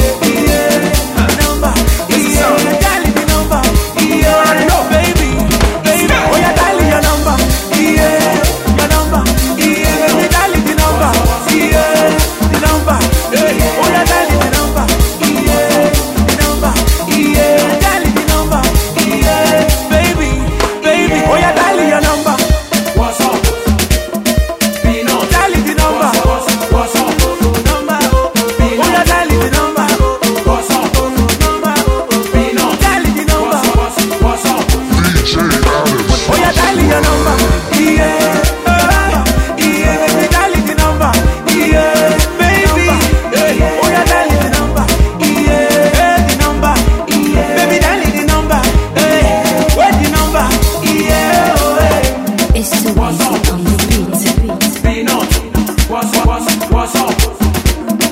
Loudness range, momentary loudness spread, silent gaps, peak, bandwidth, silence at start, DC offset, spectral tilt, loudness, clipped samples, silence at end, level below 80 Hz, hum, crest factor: 2 LU; 3 LU; none; 0 dBFS; 16.5 kHz; 0 s; under 0.1%; -4.5 dB/octave; -11 LUFS; under 0.1%; 0 s; -16 dBFS; none; 10 dB